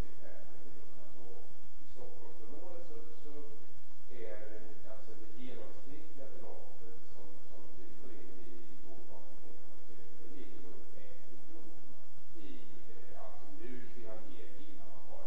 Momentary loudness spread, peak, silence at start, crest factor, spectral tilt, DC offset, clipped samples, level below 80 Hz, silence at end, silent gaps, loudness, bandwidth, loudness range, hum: 8 LU; -22 dBFS; 0 s; 18 dB; -7 dB/octave; 7%; under 0.1%; -64 dBFS; 0 s; none; -56 LUFS; 8.4 kHz; 4 LU; none